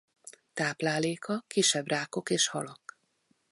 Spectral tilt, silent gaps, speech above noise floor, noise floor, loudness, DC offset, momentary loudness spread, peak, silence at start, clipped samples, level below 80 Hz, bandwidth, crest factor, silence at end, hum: -2.5 dB/octave; none; 43 dB; -73 dBFS; -29 LUFS; under 0.1%; 14 LU; -12 dBFS; 0.25 s; under 0.1%; -76 dBFS; 11.5 kHz; 20 dB; 0.75 s; none